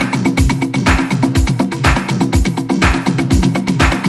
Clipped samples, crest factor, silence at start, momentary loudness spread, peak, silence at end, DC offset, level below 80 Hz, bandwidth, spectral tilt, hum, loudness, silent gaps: under 0.1%; 14 dB; 0 s; 2 LU; 0 dBFS; 0 s; under 0.1%; -20 dBFS; 13 kHz; -5.5 dB/octave; none; -14 LUFS; none